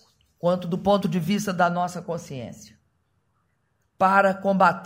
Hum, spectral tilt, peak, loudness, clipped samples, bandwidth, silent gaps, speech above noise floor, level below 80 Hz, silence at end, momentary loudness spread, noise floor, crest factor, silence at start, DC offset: none; -6 dB/octave; -4 dBFS; -23 LUFS; under 0.1%; 16 kHz; none; 48 dB; -62 dBFS; 0 s; 13 LU; -71 dBFS; 20 dB; 0.45 s; under 0.1%